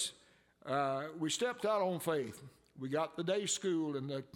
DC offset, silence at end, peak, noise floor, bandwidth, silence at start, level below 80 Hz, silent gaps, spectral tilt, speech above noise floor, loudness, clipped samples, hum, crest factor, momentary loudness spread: under 0.1%; 0.1 s; -20 dBFS; -66 dBFS; 17 kHz; 0 s; -80 dBFS; none; -4 dB/octave; 30 dB; -36 LUFS; under 0.1%; none; 16 dB; 9 LU